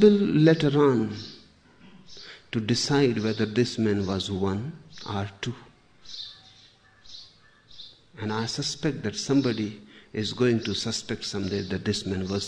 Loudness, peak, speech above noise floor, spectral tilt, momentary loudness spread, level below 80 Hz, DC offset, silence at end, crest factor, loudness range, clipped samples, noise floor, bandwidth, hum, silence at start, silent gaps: -26 LUFS; -6 dBFS; 31 dB; -5.5 dB/octave; 23 LU; -58 dBFS; 0.1%; 0 s; 20 dB; 12 LU; under 0.1%; -56 dBFS; 10 kHz; none; 0 s; none